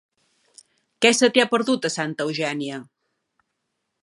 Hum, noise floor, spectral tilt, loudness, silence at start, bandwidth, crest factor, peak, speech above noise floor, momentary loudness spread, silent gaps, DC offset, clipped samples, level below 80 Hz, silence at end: none; -77 dBFS; -3 dB/octave; -21 LUFS; 1 s; 11.5 kHz; 24 dB; 0 dBFS; 56 dB; 13 LU; none; under 0.1%; under 0.1%; -76 dBFS; 1.2 s